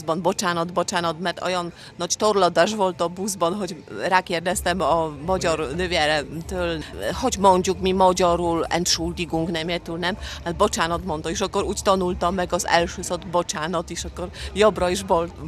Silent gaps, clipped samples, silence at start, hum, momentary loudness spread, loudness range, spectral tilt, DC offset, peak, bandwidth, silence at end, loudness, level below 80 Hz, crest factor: none; under 0.1%; 0 s; none; 10 LU; 3 LU; -4 dB/octave; under 0.1%; -2 dBFS; 14.5 kHz; 0 s; -22 LUFS; -42 dBFS; 22 dB